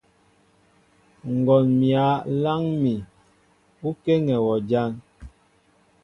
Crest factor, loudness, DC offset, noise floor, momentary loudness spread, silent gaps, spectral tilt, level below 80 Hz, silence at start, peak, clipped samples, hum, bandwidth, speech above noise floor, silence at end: 18 dB; -22 LUFS; under 0.1%; -61 dBFS; 13 LU; none; -9.5 dB/octave; -56 dBFS; 1.25 s; -6 dBFS; under 0.1%; 50 Hz at -55 dBFS; 6.4 kHz; 40 dB; 0.75 s